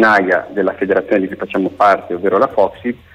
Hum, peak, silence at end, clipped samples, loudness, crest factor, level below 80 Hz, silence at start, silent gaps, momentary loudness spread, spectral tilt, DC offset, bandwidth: none; -2 dBFS; 0.2 s; under 0.1%; -15 LUFS; 12 dB; -54 dBFS; 0 s; none; 6 LU; -6.5 dB/octave; under 0.1%; 10.5 kHz